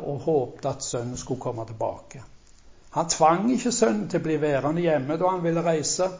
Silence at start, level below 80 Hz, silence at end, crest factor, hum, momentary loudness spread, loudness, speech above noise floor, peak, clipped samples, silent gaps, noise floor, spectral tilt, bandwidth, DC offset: 0 s; -54 dBFS; 0 s; 18 dB; none; 11 LU; -25 LUFS; 26 dB; -6 dBFS; under 0.1%; none; -50 dBFS; -5 dB/octave; 7.8 kHz; under 0.1%